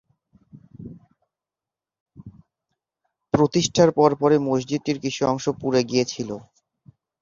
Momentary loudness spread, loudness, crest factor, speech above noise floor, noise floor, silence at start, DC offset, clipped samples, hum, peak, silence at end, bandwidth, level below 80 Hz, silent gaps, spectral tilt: 21 LU; -21 LUFS; 22 dB; 69 dB; -90 dBFS; 0.55 s; under 0.1%; under 0.1%; none; -2 dBFS; 0.8 s; 7.4 kHz; -58 dBFS; 2.00-2.06 s; -5.5 dB/octave